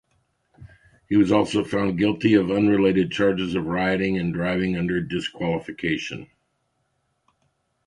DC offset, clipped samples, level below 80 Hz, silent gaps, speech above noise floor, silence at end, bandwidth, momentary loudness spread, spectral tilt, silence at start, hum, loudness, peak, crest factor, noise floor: under 0.1%; under 0.1%; -50 dBFS; none; 50 dB; 1.6 s; 10.5 kHz; 8 LU; -6.5 dB/octave; 0.6 s; none; -22 LUFS; -4 dBFS; 18 dB; -72 dBFS